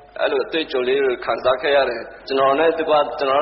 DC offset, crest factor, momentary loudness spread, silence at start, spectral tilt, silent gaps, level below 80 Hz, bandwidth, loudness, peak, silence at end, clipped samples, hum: under 0.1%; 14 dB; 5 LU; 0.15 s; -1 dB/octave; none; -54 dBFS; 5.8 kHz; -19 LUFS; -6 dBFS; 0 s; under 0.1%; none